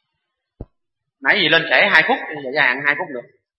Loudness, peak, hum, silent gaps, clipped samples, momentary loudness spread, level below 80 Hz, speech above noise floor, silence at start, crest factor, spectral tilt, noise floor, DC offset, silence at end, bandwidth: -15 LUFS; 0 dBFS; none; none; under 0.1%; 11 LU; -52 dBFS; 60 dB; 0.6 s; 20 dB; -5 dB/octave; -77 dBFS; under 0.1%; 0.35 s; 11 kHz